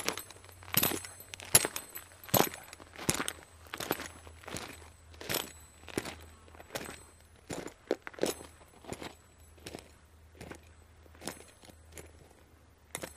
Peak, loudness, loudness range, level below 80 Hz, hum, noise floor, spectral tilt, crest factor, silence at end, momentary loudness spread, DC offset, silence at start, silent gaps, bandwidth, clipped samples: -4 dBFS; -34 LUFS; 18 LU; -60 dBFS; none; -60 dBFS; -2.5 dB/octave; 34 dB; 0 s; 23 LU; under 0.1%; 0 s; none; 15.5 kHz; under 0.1%